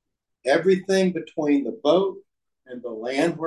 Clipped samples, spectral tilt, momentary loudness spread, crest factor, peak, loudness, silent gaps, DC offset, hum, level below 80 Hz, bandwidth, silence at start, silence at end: under 0.1%; -6 dB/octave; 13 LU; 16 dB; -6 dBFS; -23 LUFS; none; under 0.1%; none; -72 dBFS; 12 kHz; 0.45 s; 0 s